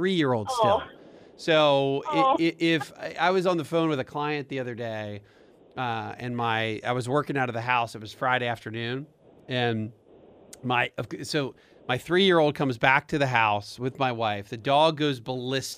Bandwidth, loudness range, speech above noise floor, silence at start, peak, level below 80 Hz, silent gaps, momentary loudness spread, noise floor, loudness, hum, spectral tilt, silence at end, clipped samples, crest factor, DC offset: 15.5 kHz; 6 LU; 27 dB; 0 s; -4 dBFS; -64 dBFS; none; 12 LU; -53 dBFS; -26 LUFS; none; -5.5 dB/octave; 0 s; under 0.1%; 22 dB; under 0.1%